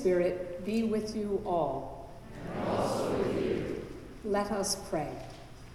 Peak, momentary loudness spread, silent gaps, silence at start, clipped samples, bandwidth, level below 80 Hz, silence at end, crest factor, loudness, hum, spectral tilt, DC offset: -18 dBFS; 14 LU; none; 0 s; under 0.1%; 15.5 kHz; -52 dBFS; 0 s; 16 dB; -33 LUFS; none; -5 dB/octave; under 0.1%